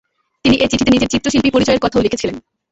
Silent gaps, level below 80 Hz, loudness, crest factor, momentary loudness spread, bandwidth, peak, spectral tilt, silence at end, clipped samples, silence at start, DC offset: none; -36 dBFS; -15 LUFS; 14 dB; 8 LU; 8.2 kHz; -2 dBFS; -4.5 dB/octave; 0.3 s; under 0.1%; 0.45 s; under 0.1%